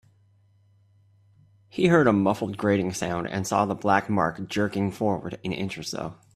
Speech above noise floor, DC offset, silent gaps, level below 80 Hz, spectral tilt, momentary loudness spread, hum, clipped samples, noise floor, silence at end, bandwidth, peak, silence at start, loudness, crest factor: 36 dB; under 0.1%; none; -60 dBFS; -6 dB/octave; 12 LU; none; under 0.1%; -61 dBFS; 0.2 s; 14.5 kHz; -6 dBFS; 1.75 s; -25 LUFS; 20 dB